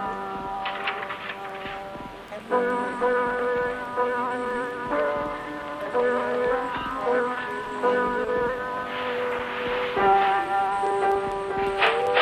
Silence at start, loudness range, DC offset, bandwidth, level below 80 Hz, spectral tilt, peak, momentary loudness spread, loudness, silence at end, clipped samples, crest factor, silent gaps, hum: 0 s; 3 LU; under 0.1%; 12.5 kHz; -54 dBFS; -4.5 dB/octave; -6 dBFS; 11 LU; -26 LUFS; 0 s; under 0.1%; 20 dB; none; none